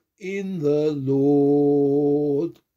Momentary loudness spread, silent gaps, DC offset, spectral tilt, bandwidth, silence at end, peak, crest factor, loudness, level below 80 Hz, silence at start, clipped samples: 10 LU; none; under 0.1%; -9 dB/octave; 7.2 kHz; 0.25 s; -10 dBFS; 10 dB; -21 LUFS; -68 dBFS; 0.2 s; under 0.1%